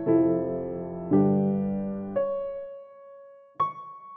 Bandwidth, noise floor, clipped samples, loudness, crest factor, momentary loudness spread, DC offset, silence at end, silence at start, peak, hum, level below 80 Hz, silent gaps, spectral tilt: 3.6 kHz; -49 dBFS; under 0.1%; -27 LUFS; 16 dB; 19 LU; under 0.1%; 0 s; 0 s; -10 dBFS; none; -62 dBFS; none; -10.5 dB/octave